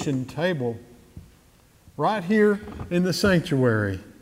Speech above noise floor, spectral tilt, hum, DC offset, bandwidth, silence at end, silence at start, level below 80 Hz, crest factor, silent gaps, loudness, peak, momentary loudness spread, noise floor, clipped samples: 33 dB; -6 dB/octave; none; under 0.1%; 16 kHz; 0.1 s; 0 s; -50 dBFS; 16 dB; none; -23 LUFS; -8 dBFS; 9 LU; -56 dBFS; under 0.1%